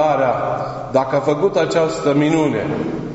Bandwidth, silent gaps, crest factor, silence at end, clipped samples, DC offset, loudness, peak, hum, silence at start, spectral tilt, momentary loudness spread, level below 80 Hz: 8 kHz; none; 14 dB; 0 s; under 0.1%; under 0.1%; -18 LUFS; -2 dBFS; none; 0 s; -5.5 dB/octave; 6 LU; -48 dBFS